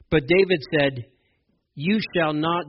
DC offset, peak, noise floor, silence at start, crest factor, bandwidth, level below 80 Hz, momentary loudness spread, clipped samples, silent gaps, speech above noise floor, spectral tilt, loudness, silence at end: under 0.1%; -6 dBFS; -69 dBFS; 0.1 s; 16 dB; 5.8 kHz; -50 dBFS; 7 LU; under 0.1%; none; 47 dB; -4 dB/octave; -22 LUFS; 0 s